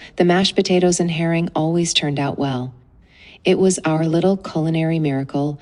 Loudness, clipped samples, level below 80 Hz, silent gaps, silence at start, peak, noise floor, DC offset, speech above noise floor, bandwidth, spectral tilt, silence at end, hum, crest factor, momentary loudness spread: -18 LUFS; under 0.1%; -52 dBFS; none; 0 s; -2 dBFS; -48 dBFS; under 0.1%; 30 dB; 11.5 kHz; -5 dB/octave; 0.05 s; none; 16 dB; 7 LU